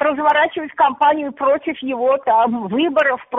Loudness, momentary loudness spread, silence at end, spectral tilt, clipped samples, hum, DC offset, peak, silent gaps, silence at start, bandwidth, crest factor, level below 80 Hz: -17 LUFS; 5 LU; 0 s; -2 dB/octave; under 0.1%; none; under 0.1%; -4 dBFS; none; 0 s; 3.9 kHz; 12 dB; -62 dBFS